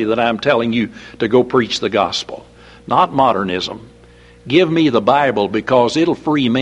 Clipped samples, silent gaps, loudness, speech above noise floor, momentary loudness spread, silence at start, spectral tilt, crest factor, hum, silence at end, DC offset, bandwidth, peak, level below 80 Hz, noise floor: under 0.1%; none; -16 LUFS; 28 dB; 10 LU; 0 s; -5.5 dB/octave; 16 dB; none; 0 s; under 0.1%; 10.5 kHz; 0 dBFS; -50 dBFS; -44 dBFS